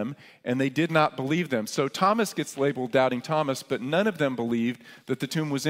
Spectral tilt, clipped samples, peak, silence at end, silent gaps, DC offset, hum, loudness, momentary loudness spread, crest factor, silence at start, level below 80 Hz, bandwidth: -5.5 dB/octave; under 0.1%; -6 dBFS; 0 s; none; under 0.1%; none; -26 LUFS; 8 LU; 20 dB; 0 s; -72 dBFS; 16 kHz